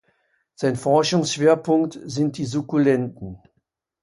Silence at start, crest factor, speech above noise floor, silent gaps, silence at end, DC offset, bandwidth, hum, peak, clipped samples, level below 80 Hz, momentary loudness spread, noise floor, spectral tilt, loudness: 0.6 s; 18 dB; 53 dB; none; 0.65 s; under 0.1%; 11.5 kHz; none; -4 dBFS; under 0.1%; -58 dBFS; 9 LU; -73 dBFS; -5.5 dB/octave; -21 LUFS